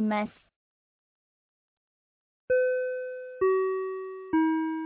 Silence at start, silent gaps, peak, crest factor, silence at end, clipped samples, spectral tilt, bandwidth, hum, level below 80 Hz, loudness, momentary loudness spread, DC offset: 0 s; 0.56-2.48 s; -16 dBFS; 14 dB; 0 s; under 0.1%; -5.5 dB/octave; 4 kHz; none; -68 dBFS; -29 LUFS; 11 LU; under 0.1%